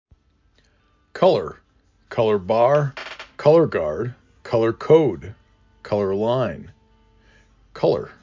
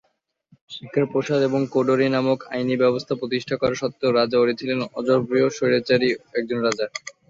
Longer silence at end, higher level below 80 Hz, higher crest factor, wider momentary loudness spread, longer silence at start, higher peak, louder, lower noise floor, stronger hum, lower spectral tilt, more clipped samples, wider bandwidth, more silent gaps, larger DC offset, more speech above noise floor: about the same, 0.15 s vs 0.2 s; first, -52 dBFS vs -60 dBFS; about the same, 20 dB vs 18 dB; first, 18 LU vs 7 LU; first, 1.15 s vs 0.7 s; about the same, -2 dBFS vs -4 dBFS; about the same, -20 LUFS vs -22 LUFS; about the same, -61 dBFS vs -64 dBFS; neither; first, -8 dB/octave vs -5.5 dB/octave; neither; about the same, 7.4 kHz vs 7.8 kHz; neither; neither; about the same, 42 dB vs 43 dB